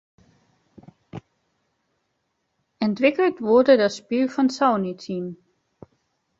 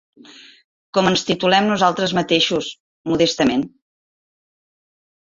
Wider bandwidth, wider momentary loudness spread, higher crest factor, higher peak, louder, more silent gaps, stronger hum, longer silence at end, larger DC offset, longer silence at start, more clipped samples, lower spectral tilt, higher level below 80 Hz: about the same, 8 kHz vs 7.8 kHz; first, 24 LU vs 9 LU; about the same, 20 dB vs 20 dB; about the same, -4 dBFS vs -2 dBFS; second, -21 LUFS vs -18 LUFS; second, none vs 2.80-3.04 s; neither; second, 1.05 s vs 1.55 s; neither; first, 1.15 s vs 0.95 s; neither; first, -6 dB/octave vs -4.5 dB/octave; second, -66 dBFS vs -56 dBFS